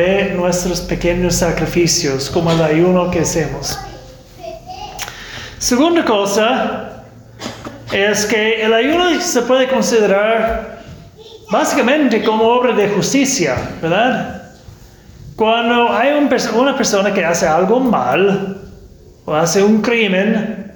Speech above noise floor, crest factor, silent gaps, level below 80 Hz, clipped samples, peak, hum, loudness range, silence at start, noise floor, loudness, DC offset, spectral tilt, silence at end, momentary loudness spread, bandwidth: 26 dB; 12 dB; none; -38 dBFS; under 0.1%; -4 dBFS; none; 4 LU; 0 s; -40 dBFS; -14 LUFS; under 0.1%; -4 dB/octave; 0.05 s; 16 LU; 19.5 kHz